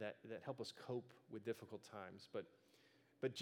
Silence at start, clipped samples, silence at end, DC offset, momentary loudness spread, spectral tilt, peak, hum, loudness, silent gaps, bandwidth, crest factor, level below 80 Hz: 0 s; under 0.1%; 0 s; under 0.1%; 7 LU; -5.5 dB/octave; -30 dBFS; none; -52 LUFS; none; 16.5 kHz; 22 dB; under -90 dBFS